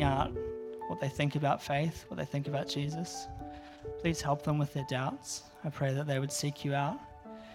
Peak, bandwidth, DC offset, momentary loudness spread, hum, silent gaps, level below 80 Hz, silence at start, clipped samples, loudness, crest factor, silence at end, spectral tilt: -14 dBFS; 15.5 kHz; under 0.1%; 12 LU; none; none; -54 dBFS; 0 s; under 0.1%; -35 LUFS; 20 dB; 0 s; -5.5 dB/octave